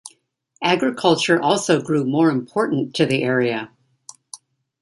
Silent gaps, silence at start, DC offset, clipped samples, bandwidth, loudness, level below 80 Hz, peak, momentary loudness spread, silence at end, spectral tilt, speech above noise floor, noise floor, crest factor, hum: none; 0.05 s; under 0.1%; under 0.1%; 11.5 kHz; -19 LUFS; -64 dBFS; -2 dBFS; 21 LU; 0.45 s; -5 dB/octave; 42 dB; -61 dBFS; 18 dB; none